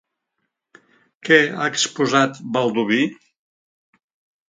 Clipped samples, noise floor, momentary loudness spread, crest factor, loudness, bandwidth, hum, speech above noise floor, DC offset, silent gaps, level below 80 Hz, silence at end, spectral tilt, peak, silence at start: under 0.1%; -76 dBFS; 7 LU; 22 dB; -18 LUFS; 9.6 kHz; none; 58 dB; under 0.1%; none; -70 dBFS; 1.35 s; -3.5 dB/octave; 0 dBFS; 1.25 s